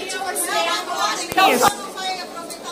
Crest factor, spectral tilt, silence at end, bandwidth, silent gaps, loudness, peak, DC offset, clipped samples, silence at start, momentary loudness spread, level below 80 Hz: 22 dB; -1 dB/octave; 0 s; 16 kHz; none; -20 LUFS; 0 dBFS; under 0.1%; under 0.1%; 0 s; 13 LU; -58 dBFS